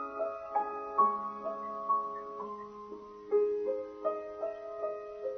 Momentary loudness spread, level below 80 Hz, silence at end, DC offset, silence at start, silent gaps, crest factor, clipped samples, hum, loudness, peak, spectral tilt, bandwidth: 13 LU; -72 dBFS; 0 s; under 0.1%; 0 s; none; 20 dB; under 0.1%; none; -35 LUFS; -16 dBFS; -5 dB/octave; 6.2 kHz